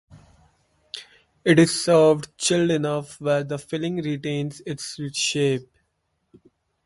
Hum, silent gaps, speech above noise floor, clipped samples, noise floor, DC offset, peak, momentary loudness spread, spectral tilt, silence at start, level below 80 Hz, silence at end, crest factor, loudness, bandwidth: none; none; 52 dB; under 0.1%; -73 dBFS; under 0.1%; -2 dBFS; 15 LU; -4.5 dB/octave; 0.15 s; -60 dBFS; 1.25 s; 22 dB; -22 LUFS; 11.5 kHz